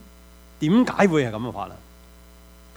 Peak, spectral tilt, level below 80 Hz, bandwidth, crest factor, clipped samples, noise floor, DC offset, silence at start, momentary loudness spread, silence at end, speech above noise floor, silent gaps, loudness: -4 dBFS; -6.5 dB/octave; -50 dBFS; over 20 kHz; 20 dB; under 0.1%; -48 dBFS; under 0.1%; 0.6 s; 15 LU; 1 s; 27 dB; none; -21 LUFS